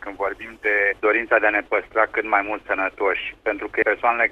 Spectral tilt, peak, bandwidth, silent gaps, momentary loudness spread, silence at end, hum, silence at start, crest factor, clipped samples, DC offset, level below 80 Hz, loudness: -5.5 dB/octave; -4 dBFS; 7.2 kHz; none; 8 LU; 0 s; none; 0 s; 18 dB; under 0.1%; under 0.1%; -54 dBFS; -21 LUFS